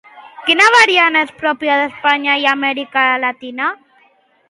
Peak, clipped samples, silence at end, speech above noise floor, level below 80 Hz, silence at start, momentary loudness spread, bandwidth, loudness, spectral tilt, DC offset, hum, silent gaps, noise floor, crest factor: 0 dBFS; under 0.1%; 0.75 s; 40 dB; -66 dBFS; 0.15 s; 12 LU; 11.5 kHz; -13 LUFS; -1 dB/octave; under 0.1%; none; none; -54 dBFS; 16 dB